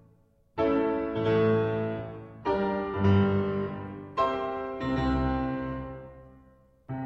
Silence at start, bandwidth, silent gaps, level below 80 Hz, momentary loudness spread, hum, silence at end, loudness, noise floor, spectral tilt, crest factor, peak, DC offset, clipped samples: 0.55 s; 6.8 kHz; none; -44 dBFS; 15 LU; none; 0 s; -28 LUFS; -62 dBFS; -9 dB/octave; 16 dB; -12 dBFS; under 0.1%; under 0.1%